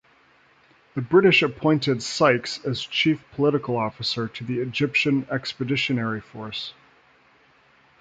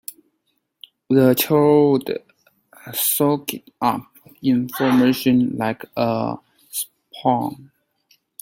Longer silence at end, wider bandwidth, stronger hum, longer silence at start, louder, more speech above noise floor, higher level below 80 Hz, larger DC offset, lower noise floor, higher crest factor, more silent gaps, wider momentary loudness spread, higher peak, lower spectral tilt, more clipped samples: first, 1.3 s vs 0.8 s; second, 9.2 kHz vs 16.5 kHz; neither; second, 0.95 s vs 1.1 s; second, -23 LUFS vs -19 LUFS; second, 35 dB vs 53 dB; about the same, -60 dBFS vs -60 dBFS; neither; second, -58 dBFS vs -71 dBFS; about the same, 20 dB vs 18 dB; neither; about the same, 13 LU vs 14 LU; about the same, -4 dBFS vs -2 dBFS; about the same, -5.5 dB/octave vs -5 dB/octave; neither